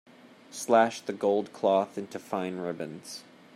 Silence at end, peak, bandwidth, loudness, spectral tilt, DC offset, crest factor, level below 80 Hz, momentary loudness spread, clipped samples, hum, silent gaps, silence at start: 0.35 s; -10 dBFS; 15.5 kHz; -29 LUFS; -4.5 dB/octave; under 0.1%; 20 dB; -80 dBFS; 18 LU; under 0.1%; none; none; 0.5 s